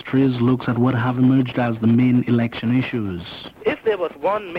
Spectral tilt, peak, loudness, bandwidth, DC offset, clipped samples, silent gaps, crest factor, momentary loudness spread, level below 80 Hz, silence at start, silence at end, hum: -9.5 dB/octave; -6 dBFS; -19 LUFS; 5.2 kHz; under 0.1%; under 0.1%; none; 14 dB; 9 LU; -52 dBFS; 0.05 s; 0 s; none